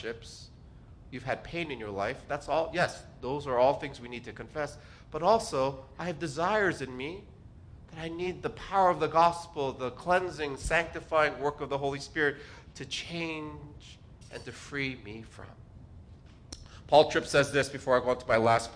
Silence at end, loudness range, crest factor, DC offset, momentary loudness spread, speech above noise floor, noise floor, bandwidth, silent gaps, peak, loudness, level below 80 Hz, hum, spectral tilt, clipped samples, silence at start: 0 s; 10 LU; 24 dB; under 0.1%; 21 LU; 22 dB; -52 dBFS; 10.5 kHz; none; -8 dBFS; -30 LUFS; -54 dBFS; none; -4.5 dB/octave; under 0.1%; 0 s